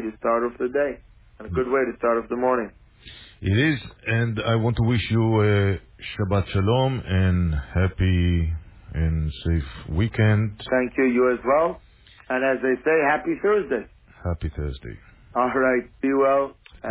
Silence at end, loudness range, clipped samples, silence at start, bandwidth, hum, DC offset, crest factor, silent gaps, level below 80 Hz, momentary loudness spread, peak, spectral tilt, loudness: 0 s; 3 LU; under 0.1%; 0 s; 4 kHz; none; under 0.1%; 14 dB; none; -34 dBFS; 12 LU; -8 dBFS; -11 dB/octave; -23 LUFS